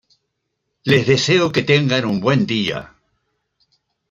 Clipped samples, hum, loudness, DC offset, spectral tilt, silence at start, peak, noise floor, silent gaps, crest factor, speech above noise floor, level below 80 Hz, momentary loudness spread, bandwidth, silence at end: under 0.1%; none; -17 LUFS; under 0.1%; -5.5 dB/octave; 0.85 s; -2 dBFS; -74 dBFS; none; 18 dB; 58 dB; -54 dBFS; 9 LU; 9 kHz; 1.25 s